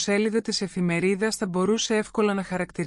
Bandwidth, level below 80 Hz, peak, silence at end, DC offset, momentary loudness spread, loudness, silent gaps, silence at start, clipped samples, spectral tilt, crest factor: 12.5 kHz; -58 dBFS; -10 dBFS; 0 s; under 0.1%; 4 LU; -25 LUFS; none; 0 s; under 0.1%; -4.5 dB/octave; 14 dB